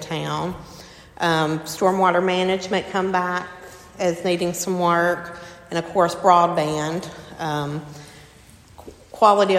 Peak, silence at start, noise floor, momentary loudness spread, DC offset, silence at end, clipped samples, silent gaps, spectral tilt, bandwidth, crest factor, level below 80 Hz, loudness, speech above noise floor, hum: 0 dBFS; 0 s; -48 dBFS; 20 LU; under 0.1%; 0 s; under 0.1%; none; -5 dB/octave; 16 kHz; 22 dB; -54 dBFS; -21 LUFS; 27 dB; none